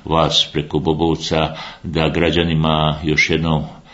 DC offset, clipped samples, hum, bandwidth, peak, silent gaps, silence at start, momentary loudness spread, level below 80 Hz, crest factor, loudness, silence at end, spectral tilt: under 0.1%; under 0.1%; none; 8 kHz; 0 dBFS; none; 0.05 s; 6 LU; -36 dBFS; 18 dB; -17 LUFS; 0.15 s; -5 dB/octave